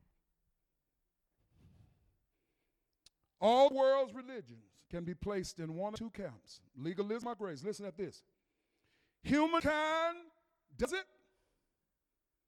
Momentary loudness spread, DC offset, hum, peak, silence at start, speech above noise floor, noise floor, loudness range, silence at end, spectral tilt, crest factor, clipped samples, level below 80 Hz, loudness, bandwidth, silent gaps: 19 LU; under 0.1%; none; -16 dBFS; 3.4 s; 53 dB; -89 dBFS; 8 LU; 1.45 s; -5 dB/octave; 22 dB; under 0.1%; -64 dBFS; -35 LUFS; 13 kHz; none